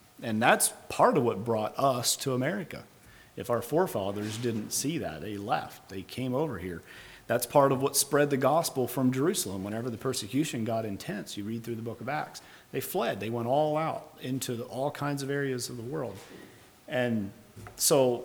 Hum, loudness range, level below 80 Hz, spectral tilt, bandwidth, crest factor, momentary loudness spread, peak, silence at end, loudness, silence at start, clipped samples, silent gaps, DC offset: none; 6 LU; -66 dBFS; -4 dB/octave; over 20 kHz; 22 dB; 16 LU; -8 dBFS; 0 s; -29 LUFS; 0.2 s; under 0.1%; none; under 0.1%